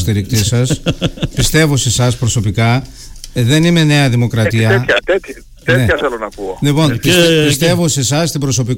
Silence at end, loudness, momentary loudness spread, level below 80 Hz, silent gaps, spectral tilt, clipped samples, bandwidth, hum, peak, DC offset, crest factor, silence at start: 0 s; -13 LUFS; 8 LU; -32 dBFS; none; -4.5 dB/octave; under 0.1%; 17 kHz; none; -2 dBFS; under 0.1%; 12 dB; 0 s